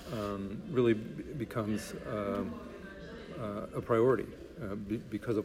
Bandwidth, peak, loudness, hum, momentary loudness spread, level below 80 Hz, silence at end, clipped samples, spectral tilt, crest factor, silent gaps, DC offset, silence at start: 16 kHz; -16 dBFS; -34 LUFS; none; 16 LU; -56 dBFS; 0 s; under 0.1%; -7 dB/octave; 18 dB; none; under 0.1%; 0 s